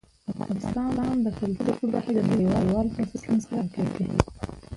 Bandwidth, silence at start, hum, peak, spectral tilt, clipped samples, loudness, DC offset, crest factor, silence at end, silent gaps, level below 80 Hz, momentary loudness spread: 11.5 kHz; 0.3 s; none; 0 dBFS; -8 dB/octave; under 0.1%; -26 LUFS; under 0.1%; 26 dB; 0 s; none; -44 dBFS; 8 LU